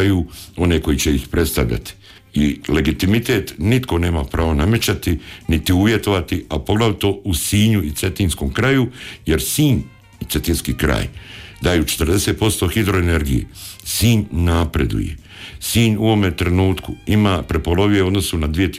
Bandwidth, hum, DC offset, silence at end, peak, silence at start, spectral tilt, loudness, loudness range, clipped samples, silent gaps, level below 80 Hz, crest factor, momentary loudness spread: 16 kHz; none; under 0.1%; 0 s; -6 dBFS; 0 s; -5 dB/octave; -18 LUFS; 2 LU; under 0.1%; none; -28 dBFS; 12 dB; 9 LU